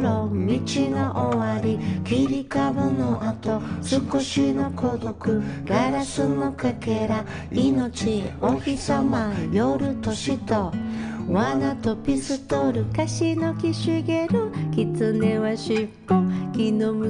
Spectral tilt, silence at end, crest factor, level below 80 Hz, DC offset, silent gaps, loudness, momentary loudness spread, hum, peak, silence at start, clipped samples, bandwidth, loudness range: -6.5 dB/octave; 0 s; 14 dB; -48 dBFS; under 0.1%; none; -24 LUFS; 4 LU; none; -10 dBFS; 0 s; under 0.1%; 10 kHz; 1 LU